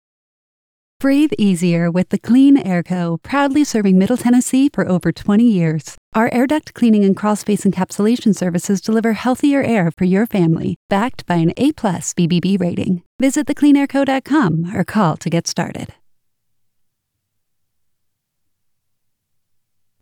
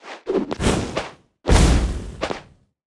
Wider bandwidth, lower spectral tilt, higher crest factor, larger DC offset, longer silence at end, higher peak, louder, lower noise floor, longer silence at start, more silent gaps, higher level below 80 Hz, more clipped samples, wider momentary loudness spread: first, 16.5 kHz vs 12 kHz; about the same, -6 dB/octave vs -5 dB/octave; second, 14 dB vs 20 dB; neither; first, 4.15 s vs 0.55 s; about the same, -4 dBFS vs -2 dBFS; first, -16 LUFS vs -22 LUFS; first, -72 dBFS vs -43 dBFS; first, 1 s vs 0.05 s; first, 5.98-6.12 s, 10.76-10.89 s, 13.06-13.19 s vs none; second, -54 dBFS vs -24 dBFS; neither; second, 6 LU vs 13 LU